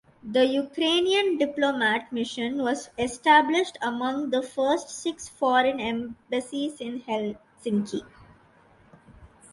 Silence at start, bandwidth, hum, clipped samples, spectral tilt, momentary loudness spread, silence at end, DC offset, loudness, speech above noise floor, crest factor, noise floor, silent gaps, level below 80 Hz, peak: 0.25 s; 11.5 kHz; none; under 0.1%; -3.5 dB/octave; 11 LU; 0.25 s; under 0.1%; -25 LUFS; 32 dB; 20 dB; -57 dBFS; none; -62 dBFS; -6 dBFS